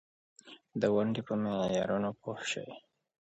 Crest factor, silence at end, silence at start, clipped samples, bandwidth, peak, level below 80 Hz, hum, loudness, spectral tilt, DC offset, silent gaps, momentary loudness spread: 20 dB; 0.45 s; 0.45 s; under 0.1%; 8.2 kHz; -14 dBFS; -68 dBFS; none; -33 LUFS; -5.5 dB/octave; under 0.1%; none; 21 LU